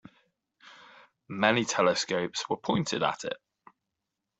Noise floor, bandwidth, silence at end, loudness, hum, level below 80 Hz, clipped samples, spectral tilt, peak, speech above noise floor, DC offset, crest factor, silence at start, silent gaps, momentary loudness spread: -85 dBFS; 8.2 kHz; 1.05 s; -28 LUFS; none; -68 dBFS; under 0.1%; -3.5 dB/octave; -6 dBFS; 57 dB; under 0.1%; 24 dB; 0.65 s; none; 13 LU